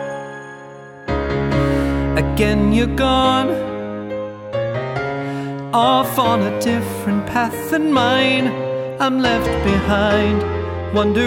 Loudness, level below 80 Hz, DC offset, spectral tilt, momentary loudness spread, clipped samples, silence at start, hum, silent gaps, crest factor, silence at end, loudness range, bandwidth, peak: -18 LUFS; -32 dBFS; under 0.1%; -6 dB/octave; 11 LU; under 0.1%; 0 s; none; none; 16 dB; 0 s; 3 LU; 16.5 kHz; -2 dBFS